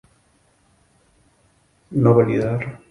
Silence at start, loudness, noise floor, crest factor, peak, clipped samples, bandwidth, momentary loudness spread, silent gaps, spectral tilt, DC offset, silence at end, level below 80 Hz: 1.9 s; -19 LUFS; -60 dBFS; 22 dB; -2 dBFS; under 0.1%; 10.5 kHz; 12 LU; none; -10 dB/octave; under 0.1%; 0.15 s; -52 dBFS